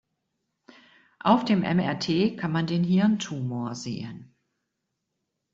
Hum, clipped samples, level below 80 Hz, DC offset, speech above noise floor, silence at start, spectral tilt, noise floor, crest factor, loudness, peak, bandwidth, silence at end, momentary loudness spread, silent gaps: none; under 0.1%; -64 dBFS; under 0.1%; 56 dB; 1.25 s; -6.5 dB/octave; -81 dBFS; 22 dB; -25 LUFS; -6 dBFS; 7.8 kHz; 1.3 s; 12 LU; none